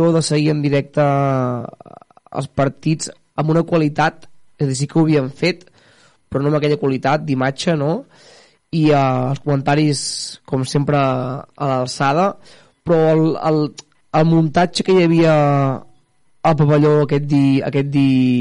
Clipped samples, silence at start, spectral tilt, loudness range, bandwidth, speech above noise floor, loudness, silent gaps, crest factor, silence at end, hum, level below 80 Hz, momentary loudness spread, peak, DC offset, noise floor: under 0.1%; 0 s; -6.5 dB/octave; 4 LU; 11 kHz; 38 dB; -17 LUFS; none; 12 dB; 0 s; none; -52 dBFS; 10 LU; -6 dBFS; under 0.1%; -54 dBFS